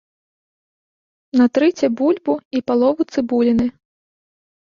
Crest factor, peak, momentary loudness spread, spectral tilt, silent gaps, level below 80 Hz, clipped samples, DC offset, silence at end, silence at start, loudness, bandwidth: 14 dB; -4 dBFS; 6 LU; -6 dB/octave; 2.45-2.51 s; -54 dBFS; under 0.1%; under 0.1%; 1.05 s; 1.35 s; -18 LUFS; 7.2 kHz